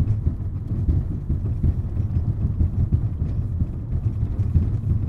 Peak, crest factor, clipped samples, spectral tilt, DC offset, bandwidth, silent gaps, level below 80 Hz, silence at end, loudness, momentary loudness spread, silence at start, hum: -6 dBFS; 16 dB; under 0.1%; -11.5 dB/octave; under 0.1%; 2.6 kHz; none; -26 dBFS; 0 s; -24 LUFS; 4 LU; 0 s; none